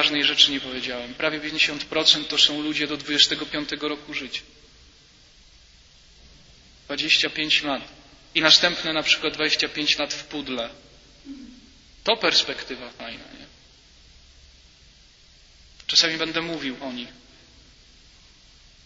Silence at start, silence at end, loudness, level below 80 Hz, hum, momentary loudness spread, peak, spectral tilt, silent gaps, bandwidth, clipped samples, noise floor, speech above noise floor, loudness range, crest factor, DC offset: 0 s; 1.75 s; -21 LUFS; -56 dBFS; none; 18 LU; 0 dBFS; -1.5 dB/octave; none; 8 kHz; under 0.1%; -53 dBFS; 29 dB; 8 LU; 26 dB; under 0.1%